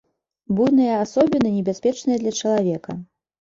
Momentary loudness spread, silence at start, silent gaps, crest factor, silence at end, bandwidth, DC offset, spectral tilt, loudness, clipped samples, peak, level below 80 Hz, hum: 10 LU; 0.5 s; none; 16 dB; 0.4 s; 7.6 kHz; under 0.1%; -6 dB/octave; -20 LUFS; under 0.1%; -4 dBFS; -58 dBFS; none